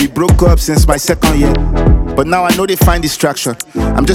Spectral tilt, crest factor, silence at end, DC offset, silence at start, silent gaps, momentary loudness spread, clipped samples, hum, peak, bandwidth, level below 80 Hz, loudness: -5.5 dB/octave; 10 dB; 0 s; under 0.1%; 0 s; none; 5 LU; 0.5%; none; 0 dBFS; 17 kHz; -16 dBFS; -12 LUFS